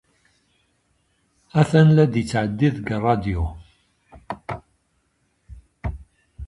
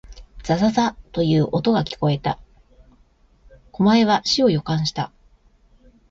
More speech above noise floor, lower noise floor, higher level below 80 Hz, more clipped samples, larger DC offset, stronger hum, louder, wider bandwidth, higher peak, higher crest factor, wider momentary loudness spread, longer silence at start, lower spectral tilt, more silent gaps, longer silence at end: first, 50 dB vs 37 dB; first, -68 dBFS vs -56 dBFS; first, -40 dBFS vs -46 dBFS; neither; neither; neither; about the same, -21 LUFS vs -20 LUFS; first, 11 kHz vs 7.8 kHz; about the same, -2 dBFS vs -4 dBFS; first, 22 dB vs 16 dB; first, 20 LU vs 13 LU; first, 1.55 s vs 0.1 s; first, -8 dB/octave vs -6 dB/octave; neither; second, 0 s vs 1.05 s